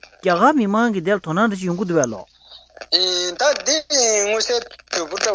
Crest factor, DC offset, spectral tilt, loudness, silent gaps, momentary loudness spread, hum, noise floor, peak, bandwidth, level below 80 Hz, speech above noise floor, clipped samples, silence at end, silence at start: 18 dB; under 0.1%; -2.5 dB/octave; -18 LUFS; none; 9 LU; none; -41 dBFS; -2 dBFS; 8 kHz; -58 dBFS; 22 dB; under 0.1%; 0 s; 0.25 s